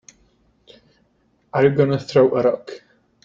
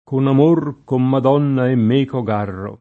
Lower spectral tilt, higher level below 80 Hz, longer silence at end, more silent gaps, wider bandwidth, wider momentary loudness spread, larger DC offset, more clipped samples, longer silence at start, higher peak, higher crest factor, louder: second, -7.5 dB/octave vs -10 dB/octave; about the same, -58 dBFS vs -60 dBFS; first, 0.5 s vs 0.05 s; neither; first, 7.4 kHz vs 4.3 kHz; first, 18 LU vs 8 LU; neither; neither; first, 1.55 s vs 0.1 s; about the same, -4 dBFS vs -2 dBFS; about the same, 18 dB vs 14 dB; about the same, -18 LUFS vs -16 LUFS